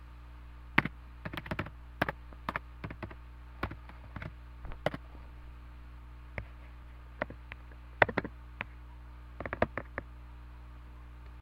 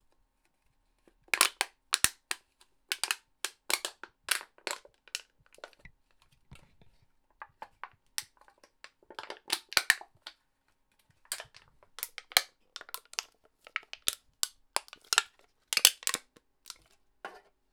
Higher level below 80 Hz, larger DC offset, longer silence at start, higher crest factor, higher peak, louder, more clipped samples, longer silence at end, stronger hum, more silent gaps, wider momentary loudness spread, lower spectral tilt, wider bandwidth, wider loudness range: first, -48 dBFS vs -68 dBFS; neither; second, 0 s vs 1.35 s; about the same, 36 dB vs 34 dB; about the same, -4 dBFS vs -4 dBFS; second, -37 LUFS vs -31 LUFS; neither; second, 0 s vs 0.35 s; first, 60 Hz at -50 dBFS vs none; neither; second, 20 LU vs 23 LU; first, -7 dB/octave vs 2 dB/octave; second, 16 kHz vs over 20 kHz; second, 8 LU vs 17 LU